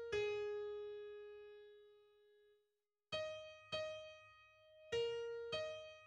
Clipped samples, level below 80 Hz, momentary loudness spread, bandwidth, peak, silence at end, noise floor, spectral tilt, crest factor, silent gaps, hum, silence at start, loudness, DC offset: under 0.1%; -76 dBFS; 22 LU; 10 kHz; -32 dBFS; 0 s; -89 dBFS; -3 dB/octave; 16 dB; none; none; 0 s; -46 LUFS; under 0.1%